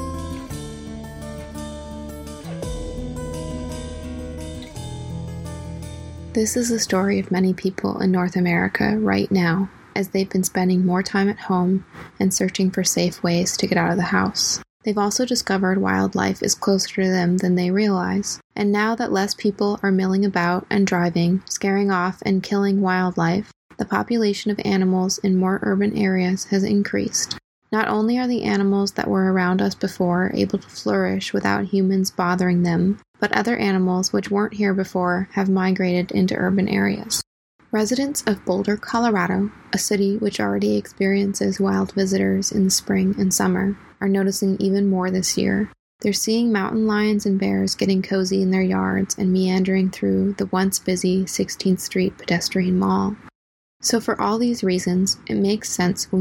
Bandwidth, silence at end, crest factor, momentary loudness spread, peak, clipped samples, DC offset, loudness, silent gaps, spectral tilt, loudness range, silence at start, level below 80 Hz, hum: 17 kHz; 0 s; 18 dB; 11 LU; -2 dBFS; under 0.1%; under 0.1%; -21 LUFS; 14.70-14.80 s, 18.44-18.50 s, 23.56-23.69 s, 27.44-27.62 s, 33.08-33.14 s, 37.27-37.59 s, 45.79-45.99 s, 53.35-53.80 s; -5 dB/octave; 2 LU; 0 s; -46 dBFS; none